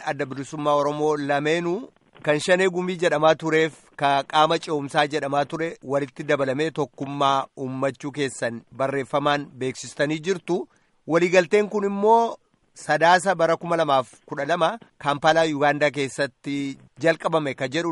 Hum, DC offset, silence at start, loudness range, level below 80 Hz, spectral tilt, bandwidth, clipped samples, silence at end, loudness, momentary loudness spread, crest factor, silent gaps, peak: none; under 0.1%; 0 s; 5 LU; -68 dBFS; -5 dB/octave; 11.5 kHz; under 0.1%; 0 s; -23 LUFS; 11 LU; 18 dB; none; -4 dBFS